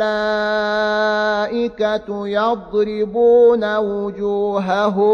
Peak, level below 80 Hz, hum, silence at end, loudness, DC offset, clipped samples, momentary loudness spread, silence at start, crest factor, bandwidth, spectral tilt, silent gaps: -4 dBFS; -50 dBFS; none; 0 s; -17 LUFS; under 0.1%; under 0.1%; 8 LU; 0 s; 12 dB; 7 kHz; -6 dB/octave; none